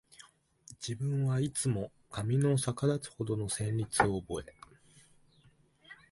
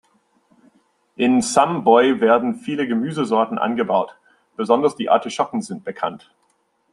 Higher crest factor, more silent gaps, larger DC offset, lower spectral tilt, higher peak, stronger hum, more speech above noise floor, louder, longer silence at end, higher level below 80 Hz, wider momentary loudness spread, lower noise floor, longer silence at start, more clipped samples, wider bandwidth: first, 24 dB vs 18 dB; neither; neither; about the same, -5.5 dB/octave vs -5 dB/octave; second, -10 dBFS vs -2 dBFS; neither; second, 33 dB vs 47 dB; second, -33 LUFS vs -19 LUFS; second, 0.15 s vs 0.75 s; first, -58 dBFS vs -66 dBFS; about the same, 12 LU vs 13 LU; about the same, -65 dBFS vs -65 dBFS; second, 0.7 s vs 1.2 s; neither; about the same, 11.5 kHz vs 11.5 kHz